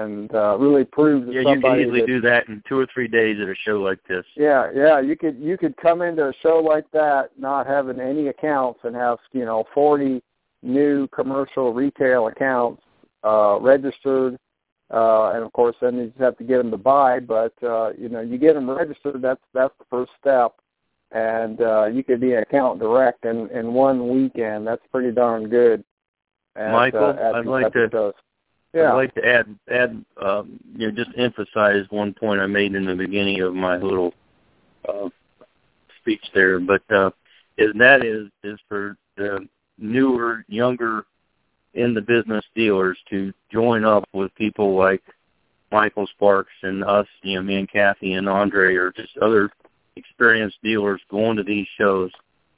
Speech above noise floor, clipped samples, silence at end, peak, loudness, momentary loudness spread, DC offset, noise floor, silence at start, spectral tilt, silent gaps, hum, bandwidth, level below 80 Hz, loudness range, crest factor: 51 dB; under 0.1%; 0.5 s; 0 dBFS; -20 LUFS; 10 LU; under 0.1%; -70 dBFS; 0 s; -9.5 dB/octave; 14.72-14.76 s, 25.91-25.97 s, 26.08-26.14 s; none; 4 kHz; -58 dBFS; 4 LU; 20 dB